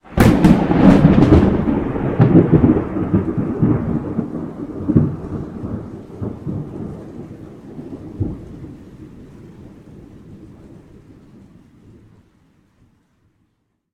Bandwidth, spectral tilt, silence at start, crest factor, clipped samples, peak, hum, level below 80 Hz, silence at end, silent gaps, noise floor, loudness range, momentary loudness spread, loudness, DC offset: 15.5 kHz; -9 dB/octave; 0.1 s; 18 dB; under 0.1%; 0 dBFS; none; -32 dBFS; 3.25 s; none; -67 dBFS; 20 LU; 23 LU; -16 LUFS; under 0.1%